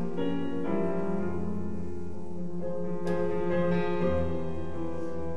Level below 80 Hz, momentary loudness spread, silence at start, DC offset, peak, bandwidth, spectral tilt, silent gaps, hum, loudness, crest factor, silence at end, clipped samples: -46 dBFS; 10 LU; 0 s; 3%; -14 dBFS; 9.6 kHz; -8.5 dB/octave; none; none; -32 LUFS; 14 dB; 0 s; under 0.1%